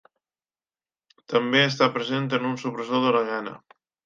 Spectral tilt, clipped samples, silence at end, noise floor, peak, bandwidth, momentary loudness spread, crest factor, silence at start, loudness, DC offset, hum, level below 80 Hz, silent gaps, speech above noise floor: -5.5 dB/octave; under 0.1%; 0.5 s; under -90 dBFS; -4 dBFS; 7.4 kHz; 10 LU; 22 dB; 1.3 s; -23 LUFS; under 0.1%; none; -76 dBFS; none; over 66 dB